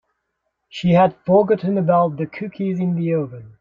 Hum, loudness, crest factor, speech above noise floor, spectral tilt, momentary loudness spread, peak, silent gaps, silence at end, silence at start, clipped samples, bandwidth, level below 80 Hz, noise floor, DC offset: none; -19 LUFS; 18 dB; 56 dB; -9 dB/octave; 12 LU; -2 dBFS; none; 0.1 s; 0.75 s; under 0.1%; 7 kHz; -56 dBFS; -75 dBFS; under 0.1%